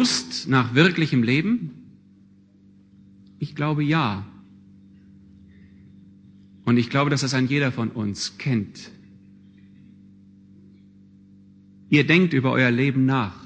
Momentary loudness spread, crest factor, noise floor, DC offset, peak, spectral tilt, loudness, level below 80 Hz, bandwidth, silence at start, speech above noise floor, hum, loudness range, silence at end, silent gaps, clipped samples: 16 LU; 22 dB; -53 dBFS; under 0.1%; -2 dBFS; -5.5 dB/octave; -21 LUFS; -62 dBFS; 9.6 kHz; 0 s; 32 dB; none; 7 LU; 0 s; none; under 0.1%